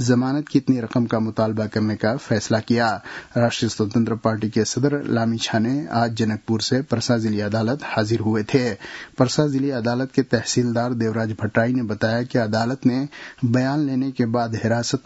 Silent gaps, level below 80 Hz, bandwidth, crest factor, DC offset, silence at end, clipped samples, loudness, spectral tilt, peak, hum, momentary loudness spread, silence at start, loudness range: none; -58 dBFS; 8 kHz; 20 dB; under 0.1%; 0.05 s; under 0.1%; -21 LUFS; -5.5 dB/octave; 0 dBFS; none; 3 LU; 0 s; 1 LU